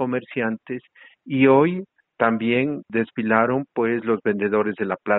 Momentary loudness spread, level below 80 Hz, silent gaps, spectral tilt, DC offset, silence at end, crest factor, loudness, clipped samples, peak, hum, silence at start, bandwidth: 11 LU; -64 dBFS; none; -5.5 dB/octave; under 0.1%; 0 s; 18 dB; -21 LUFS; under 0.1%; -4 dBFS; none; 0 s; 4.1 kHz